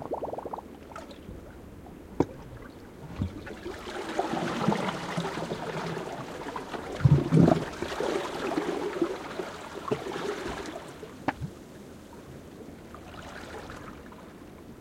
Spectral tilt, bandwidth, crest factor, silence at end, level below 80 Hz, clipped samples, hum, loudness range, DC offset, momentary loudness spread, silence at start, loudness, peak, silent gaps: -6.5 dB/octave; 16 kHz; 26 dB; 0 s; -52 dBFS; under 0.1%; none; 13 LU; under 0.1%; 19 LU; 0 s; -31 LUFS; -6 dBFS; none